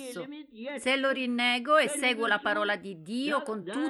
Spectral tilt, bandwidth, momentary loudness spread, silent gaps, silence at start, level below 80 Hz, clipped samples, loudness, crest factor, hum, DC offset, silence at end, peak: -2.5 dB/octave; 13 kHz; 15 LU; none; 0 s; -78 dBFS; under 0.1%; -27 LUFS; 18 dB; none; under 0.1%; 0 s; -12 dBFS